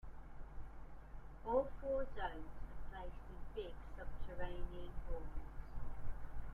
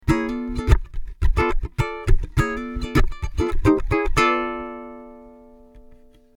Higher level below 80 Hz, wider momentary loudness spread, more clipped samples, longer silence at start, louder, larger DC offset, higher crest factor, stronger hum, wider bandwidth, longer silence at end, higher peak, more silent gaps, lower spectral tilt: second, -48 dBFS vs -24 dBFS; first, 18 LU vs 15 LU; neither; about the same, 0.05 s vs 0.05 s; second, -48 LUFS vs -23 LUFS; neither; about the same, 18 dB vs 20 dB; neither; second, 3.7 kHz vs 12.5 kHz; second, 0 s vs 0.55 s; second, -24 dBFS vs -2 dBFS; neither; about the same, -7.5 dB/octave vs -6.5 dB/octave